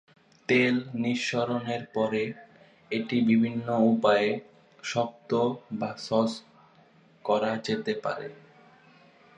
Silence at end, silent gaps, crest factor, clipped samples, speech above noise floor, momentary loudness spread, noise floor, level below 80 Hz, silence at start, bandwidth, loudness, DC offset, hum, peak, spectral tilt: 1 s; none; 18 dB; under 0.1%; 32 dB; 13 LU; -59 dBFS; -72 dBFS; 0.5 s; 9.2 kHz; -27 LUFS; under 0.1%; none; -10 dBFS; -5.5 dB/octave